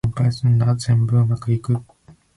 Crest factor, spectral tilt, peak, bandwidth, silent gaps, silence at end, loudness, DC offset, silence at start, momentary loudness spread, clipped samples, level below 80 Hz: 10 dB; -7.5 dB/octave; -8 dBFS; 11.5 kHz; none; 0.25 s; -19 LUFS; under 0.1%; 0.05 s; 6 LU; under 0.1%; -44 dBFS